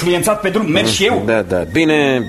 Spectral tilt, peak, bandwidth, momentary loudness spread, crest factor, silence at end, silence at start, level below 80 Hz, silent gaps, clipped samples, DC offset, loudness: -4.5 dB/octave; 0 dBFS; 13.5 kHz; 4 LU; 14 dB; 0 s; 0 s; -42 dBFS; none; under 0.1%; under 0.1%; -14 LUFS